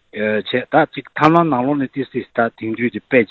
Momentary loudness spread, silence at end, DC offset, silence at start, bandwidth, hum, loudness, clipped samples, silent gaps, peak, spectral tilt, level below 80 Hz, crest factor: 9 LU; 0.05 s; under 0.1%; 0.15 s; 7.6 kHz; none; -18 LUFS; under 0.1%; none; 0 dBFS; -8 dB/octave; -56 dBFS; 18 dB